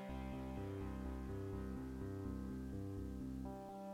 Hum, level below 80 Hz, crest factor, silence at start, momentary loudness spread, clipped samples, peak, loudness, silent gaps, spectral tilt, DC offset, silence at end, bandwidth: none; -52 dBFS; 12 dB; 0 s; 1 LU; under 0.1%; -34 dBFS; -48 LUFS; none; -8 dB/octave; under 0.1%; 0 s; 16 kHz